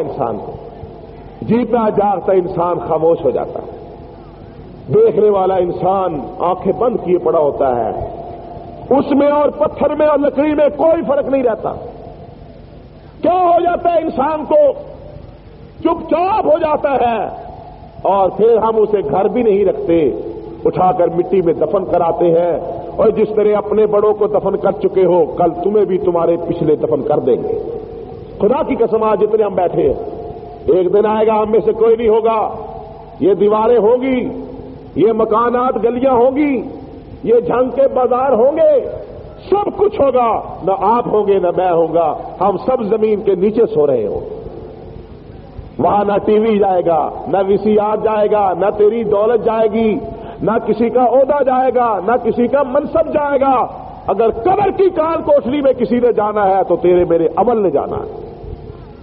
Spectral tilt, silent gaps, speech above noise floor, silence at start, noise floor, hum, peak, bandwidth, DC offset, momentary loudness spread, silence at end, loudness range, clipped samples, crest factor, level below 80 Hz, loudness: -6.5 dB/octave; none; 23 dB; 0 s; -37 dBFS; none; -4 dBFS; 4.8 kHz; under 0.1%; 17 LU; 0 s; 3 LU; under 0.1%; 12 dB; -42 dBFS; -14 LUFS